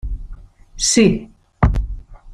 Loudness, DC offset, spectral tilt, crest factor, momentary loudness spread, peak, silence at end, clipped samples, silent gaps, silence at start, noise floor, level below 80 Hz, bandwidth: -17 LUFS; under 0.1%; -4.5 dB/octave; 18 dB; 20 LU; -2 dBFS; 0 s; under 0.1%; none; 0.05 s; -37 dBFS; -26 dBFS; 15 kHz